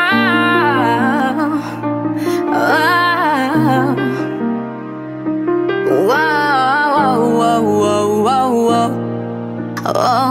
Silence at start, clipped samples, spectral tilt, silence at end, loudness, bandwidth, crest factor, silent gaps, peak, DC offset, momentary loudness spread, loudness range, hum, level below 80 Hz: 0 s; under 0.1%; -5.5 dB/octave; 0 s; -15 LUFS; 16 kHz; 14 dB; none; -2 dBFS; under 0.1%; 9 LU; 3 LU; none; -58 dBFS